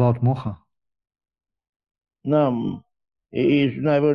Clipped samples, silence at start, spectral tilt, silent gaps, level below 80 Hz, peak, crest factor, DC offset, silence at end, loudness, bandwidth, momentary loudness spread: under 0.1%; 0 s; -10 dB/octave; 1.69-1.80 s; -54 dBFS; -6 dBFS; 16 dB; under 0.1%; 0 s; -22 LUFS; 5.2 kHz; 15 LU